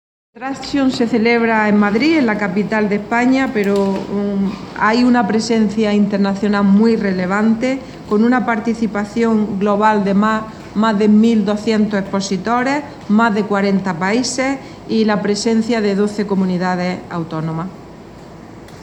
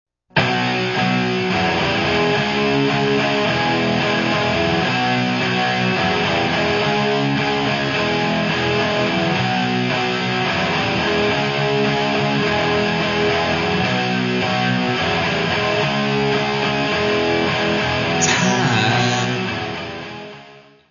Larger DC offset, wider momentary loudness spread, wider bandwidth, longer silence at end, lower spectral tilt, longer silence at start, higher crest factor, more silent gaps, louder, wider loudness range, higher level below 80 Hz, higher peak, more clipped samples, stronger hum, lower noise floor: neither; first, 9 LU vs 2 LU; first, 9.6 kHz vs 7.4 kHz; second, 0 s vs 0.3 s; first, -6 dB/octave vs -4.5 dB/octave; about the same, 0.35 s vs 0.35 s; about the same, 14 dB vs 16 dB; neither; about the same, -16 LUFS vs -18 LUFS; about the same, 3 LU vs 1 LU; about the same, -48 dBFS vs -46 dBFS; about the same, -2 dBFS vs -2 dBFS; neither; neither; second, -36 dBFS vs -44 dBFS